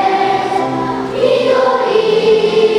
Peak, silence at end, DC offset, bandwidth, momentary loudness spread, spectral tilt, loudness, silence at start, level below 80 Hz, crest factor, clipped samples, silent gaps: 0 dBFS; 0 s; under 0.1%; 11 kHz; 6 LU; -5 dB/octave; -13 LUFS; 0 s; -50 dBFS; 12 dB; under 0.1%; none